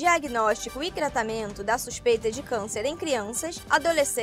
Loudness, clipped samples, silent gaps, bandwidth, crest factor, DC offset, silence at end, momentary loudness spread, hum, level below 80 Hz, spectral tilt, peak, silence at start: -26 LUFS; under 0.1%; none; 16 kHz; 18 dB; under 0.1%; 0 s; 8 LU; none; -50 dBFS; -2.5 dB/octave; -10 dBFS; 0 s